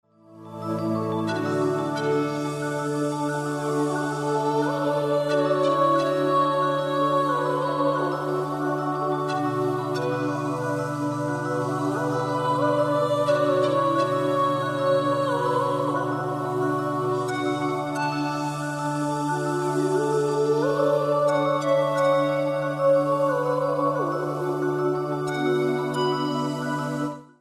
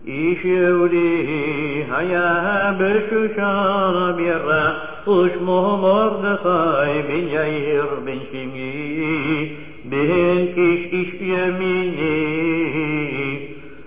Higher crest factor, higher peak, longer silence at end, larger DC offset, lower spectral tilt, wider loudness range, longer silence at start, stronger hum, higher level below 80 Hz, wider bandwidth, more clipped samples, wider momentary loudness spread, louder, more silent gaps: about the same, 14 dB vs 14 dB; second, -10 dBFS vs -6 dBFS; about the same, 0.15 s vs 0.05 s; second, under 0.1% vs 1%; second, -6.5 dB/octave vs -10 dB/octave; about the same, 4 LU vs 3 LU; first, 0.3 s vs 0.05 s; neither; second, -64 dBFS vs -52 dBFS; first, 14 kHz vs 3.9 kHz; neither; second, 6 LU vs 9 LU; second, -24 LUFS vs -19 LUFS; neither